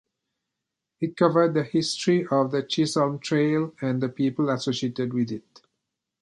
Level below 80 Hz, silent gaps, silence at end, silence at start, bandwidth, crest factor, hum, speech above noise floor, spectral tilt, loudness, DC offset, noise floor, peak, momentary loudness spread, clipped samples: -70 dBFS; none; 0.8 s; 1 s; 11.5 kHz; 20 dB; none; 60 dB; -6 dB/octave; -24 LUFS; under 0.1%; -84 dBFS; -6 dBFS; 6 LU; under 0.1%